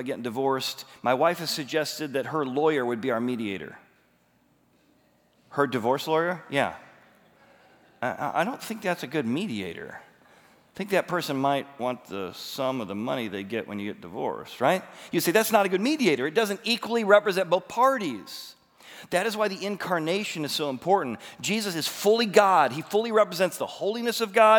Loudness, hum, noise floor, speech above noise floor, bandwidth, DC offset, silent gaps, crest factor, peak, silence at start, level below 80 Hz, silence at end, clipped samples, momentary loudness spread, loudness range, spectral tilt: -26 LUFS; none; -65 dBFS; 39 dB; over 20 kHz; under 0.1%; none; 24 dB; -4 dBFS; 0 s; -76 dBFS; 0 s; under 0.1%; 13 LU; 7 LU; -4 dB/octave